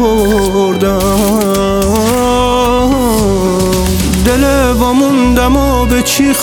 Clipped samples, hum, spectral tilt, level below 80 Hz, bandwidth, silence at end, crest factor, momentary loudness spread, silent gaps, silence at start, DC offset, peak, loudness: under 0.1%; none; -5 dB/octave; -20 dBFS; over 20 kHz; 0 s; 10 dB; 2 LU; none; 0 s; under 0.1%; 0 dBFS; -10 LUFS